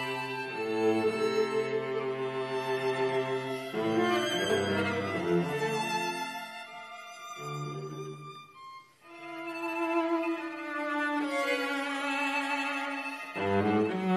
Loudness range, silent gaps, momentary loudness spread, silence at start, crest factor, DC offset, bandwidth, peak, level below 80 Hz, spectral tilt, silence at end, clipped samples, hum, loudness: 8 LU; none; 15 LU; 0 s; 16 dB; under 0.1%; 14 kHz; -16 dBFS; -66 dBFS; -5 dB/octave; 0 s; under 0.1%; none; -31 LUFS